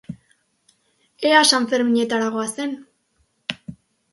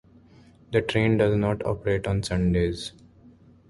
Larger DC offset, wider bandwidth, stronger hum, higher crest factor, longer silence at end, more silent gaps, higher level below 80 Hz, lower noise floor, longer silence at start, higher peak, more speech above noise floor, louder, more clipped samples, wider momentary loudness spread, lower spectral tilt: neither; about the same, 12 kHz vs 11.5 kHz; neither; about the same, 22 dB vs 18 dB; second, 0.4 s vs 0.8 s; neither; second, -64 dBFS vs -42 dBFS; first, -67 dBFS vs -53 dBFS; second, 0.1 s vs 0.7 s; first, -2 dBFS vs -8 dBFS; first, 48 dB vs 30 dB; first, -19 LUFS vs -25 LUFS; neither; first, 24 LU vs 7 LU; second, -2.5 dB/octave vs -6.5 dB/octave